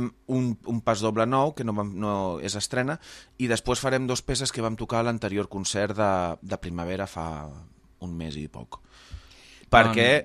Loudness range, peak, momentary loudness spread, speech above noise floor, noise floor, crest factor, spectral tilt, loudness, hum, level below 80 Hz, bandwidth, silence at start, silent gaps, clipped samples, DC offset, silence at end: 5 LU; 0 dBFS; 18 LU; 25 dB; -51 dBFS; 26 dB; -4.5 dB/octave; -26 LUFS; none; -48 dBFS; 14.5 kHz; 0 s; none; under 0.1%; under 0.1%; 0 s